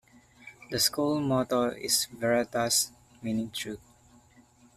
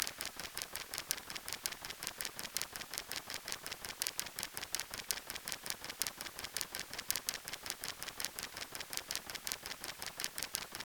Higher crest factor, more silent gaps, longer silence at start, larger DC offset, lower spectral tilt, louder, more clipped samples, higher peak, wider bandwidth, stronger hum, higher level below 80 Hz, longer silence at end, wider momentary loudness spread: second, 20 dB vs 38 dB; neither; first, 0.45 s vs 0 s; neither; first, -3 dB/octave vs 0 dB/octave; first, -28 LUFS vs -41 LUFS; neither; second, -10 dBFS vs -6 dBFS; second, 15.5 kHz vs over 20 kHz; neither; first, -62 dBFS vs -68 dBFS; first, 1 s vs 0.05 s; first, 13 LU vs 5 LU